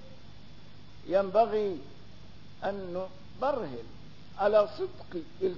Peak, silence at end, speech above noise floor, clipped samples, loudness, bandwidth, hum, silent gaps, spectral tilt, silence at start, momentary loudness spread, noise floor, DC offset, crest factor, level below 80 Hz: -12 dBFS; 0 s; 23 dB; under 0.1%; -30 LUFS; 6 kHz; 50 Hz at -55 dBFS; none; -4.5 dB/octave; 0.05 s; 25 LU; -52 dBFS; 0.6%; 20 dB; -60 dBFS